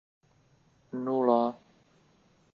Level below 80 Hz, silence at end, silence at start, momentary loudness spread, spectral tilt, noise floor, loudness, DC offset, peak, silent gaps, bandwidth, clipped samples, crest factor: -78 dBFS; 1 s; 0.95 s; 17 LU; -8.5 dB/octave; -65 dBFS; -29 LUFS; under 0.1%; -10 dBFS; none; 6.8 kHz; under 0.1%; 22 dB